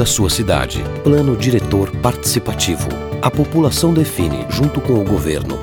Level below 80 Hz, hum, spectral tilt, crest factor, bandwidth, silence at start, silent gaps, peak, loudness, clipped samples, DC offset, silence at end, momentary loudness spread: -30 dBFS; none; -5 dB/octave; 16 dB; over 20 kHz; 0 s; none; 0 dBFS; -16 LUFS; under 0.1%; under 0.1%; 0 s; 5 LU